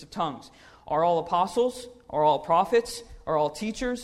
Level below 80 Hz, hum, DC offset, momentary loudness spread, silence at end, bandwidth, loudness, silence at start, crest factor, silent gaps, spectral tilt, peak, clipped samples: -52 dBFS; none; under 0.1%; 13 LU; 0 s; 14 kHz; -26 LUFS; 0 s; 16 dB; none; -5 dB/octave; -10 dBFS; under 0.1%